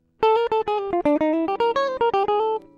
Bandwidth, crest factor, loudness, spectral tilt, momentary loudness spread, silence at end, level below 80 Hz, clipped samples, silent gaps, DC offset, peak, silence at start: 7.2 kHz; 12 dB; -21 LUFS; -5.5 dB/octave; 3 LU; 0.2 s; -56 dBFS; under 0.1%; none; under 0.1%; -8 dBFS; 0.2 s